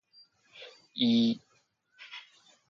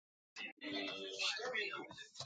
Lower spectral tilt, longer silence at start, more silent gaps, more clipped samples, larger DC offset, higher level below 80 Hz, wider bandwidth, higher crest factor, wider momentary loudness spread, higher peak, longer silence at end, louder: first, -5.5 dB/octave vs -1.5 dB/octave; first, 0.6 s vs 0.35 s; second, none vs 0.52-0.57 s; neither; neither; first, -80 dBFS vs -86 dBFS; second, 6.8 kHz vs 9 kHz; about the same, 20 dB vs 18 dB; first, 24 LU vs 11 LU; first, -14 dBFS vs -26 dBFS; first, 0.5 s vs 0 s; first, -28 LUFS vs -42 LUFS